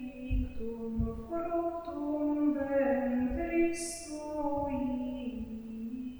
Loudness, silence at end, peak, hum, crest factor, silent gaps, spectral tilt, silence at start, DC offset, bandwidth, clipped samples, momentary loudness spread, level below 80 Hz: -34 LUFS; 0 s; -18 dBFS; none; 14 dB; none; -6 dB/octave; 0 s; under 0.1%; over 20 kHz; under 0.1%; 10 LU; -44 dBFS